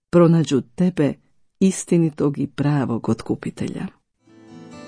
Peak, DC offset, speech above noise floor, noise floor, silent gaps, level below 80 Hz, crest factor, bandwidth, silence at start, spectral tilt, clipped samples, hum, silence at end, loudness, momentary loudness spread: -4 dBFS; under 0.1%; 32 dB; -51 dBFS; none; -54 dBFS; 16 dB; 10.5 kHz; 0.15 s; -7 dB/octave; under 0.1%; none; 0 s; -20 LUFS; 14 LU